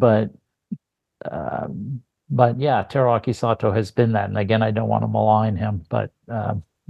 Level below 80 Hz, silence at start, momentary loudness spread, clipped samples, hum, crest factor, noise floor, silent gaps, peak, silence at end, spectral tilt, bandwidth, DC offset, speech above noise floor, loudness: -48 dBFS; 0 s; 15 LU; under 0.1%; none; 20 dB; -44 dBFS; none; -2 dBFS; 0.3 s; -8.5 dB/octave; 8.8 kHz; under 0.1%; 24 dB; -21 LUFS